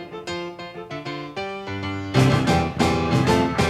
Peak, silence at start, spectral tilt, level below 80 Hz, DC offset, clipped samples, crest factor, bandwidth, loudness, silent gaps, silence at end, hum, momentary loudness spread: -4 dBFS; 0 s; -6 dB/octave; -40 dBFS; under 0.1%; under 0.1%; 18 dB; 14.5 kHz; -22 LUFS; none; 0 s; none; 14 LU